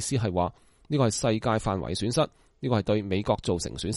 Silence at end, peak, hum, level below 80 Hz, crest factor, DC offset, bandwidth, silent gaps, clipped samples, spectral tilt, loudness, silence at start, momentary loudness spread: 0 s; -10 dBFS; none; -48 dBFS; 16 dB; under 0.1%; 11.5 kHz; none; under 0.1%; -5.5 dB/octave; -27 LUFS; 0 s; 5 LU